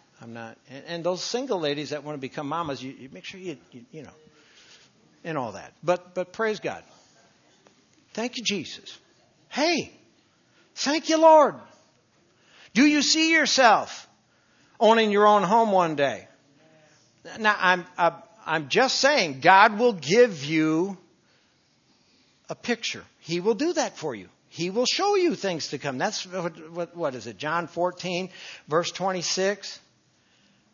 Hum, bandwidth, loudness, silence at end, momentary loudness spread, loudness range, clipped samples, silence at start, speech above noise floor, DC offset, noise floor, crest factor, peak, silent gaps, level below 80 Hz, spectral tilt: none; 7.4 kHz; -23 LUFS; 0.95 s; 22 LU; 12 LU; under 0.1%; 0.2 s; 41 dB; under 0.1%; -64 dBFS; 24 dB; 0 dBFS; none; -76 dBFS; -3.5 dB/octave